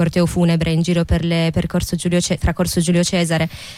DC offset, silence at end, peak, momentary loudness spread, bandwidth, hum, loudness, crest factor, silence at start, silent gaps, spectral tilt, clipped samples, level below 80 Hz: under 0.1%; 0 s; -6 dBFS; 4 LU; 15 kHz; none; -18 LUFS; 12 dB; 0 s; none; -5.5 dB/octave; under 0.1%; -30 dBFS